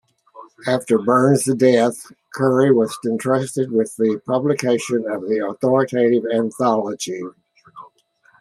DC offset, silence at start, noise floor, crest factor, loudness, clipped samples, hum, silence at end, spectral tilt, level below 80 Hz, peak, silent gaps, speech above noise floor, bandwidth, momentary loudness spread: under 0.1%; 0.35 s; -57 dBFS; 16 dB; -19 LUFS; under 0.1%; none; 0.55 s; -6 dB/octave; -66 dBFS; -2 dBFS; none; 39 dB; 13.5 kHz; 10 LU